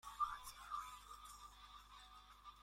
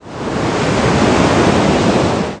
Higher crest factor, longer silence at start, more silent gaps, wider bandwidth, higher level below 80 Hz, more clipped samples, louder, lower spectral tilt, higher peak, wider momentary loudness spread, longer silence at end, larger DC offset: first, 22 dB vs 14 dB; about the same, 0.05 s vs 0.05 s; neither; first, 16.5 kHz vs 10.5 kHz; second, -68 dBFS vs -32 dBFS; neither; second, -52 LUFS vs -13 LUFS; second, -0.5 dB/octave vs -5.5 dB/octave; second, -30 dBFS vs 0 dBFS; first, 16 LU vs 6 LU; about the same, 0 s vs 0 s; neither